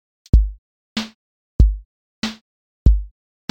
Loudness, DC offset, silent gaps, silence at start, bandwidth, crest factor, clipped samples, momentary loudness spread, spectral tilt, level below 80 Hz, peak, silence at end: -21 LUFS; under 0.1%; 0.58-0.96 s, 1.15-1.59 s, 1.85-2.22 s, 2.41-2.86 s; 0.35 s; 8 kHz; 18 dB; under 0.1%; 16 LU; -6.5 dB/octave; -20 dBFS; 0 dBFS; 0.45 s